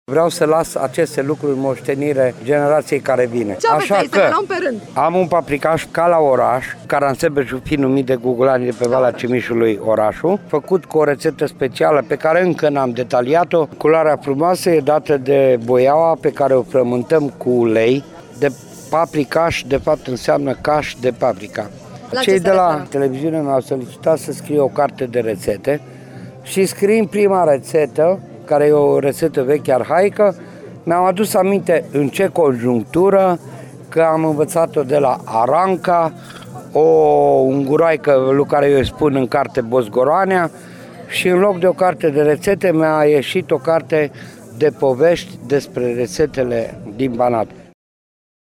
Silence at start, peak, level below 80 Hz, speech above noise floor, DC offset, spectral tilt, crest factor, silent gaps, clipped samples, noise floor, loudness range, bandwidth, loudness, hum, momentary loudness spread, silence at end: 0.1 s; -4 dBFS; -48 dBFS; 19 dB; under 0.1%; -6 dB/octave; 12 dB; none; under 0.1%; -35 dBFS; 4 LU; 19 kHz; -16 LUFS; none; 7 LU; 0.85 s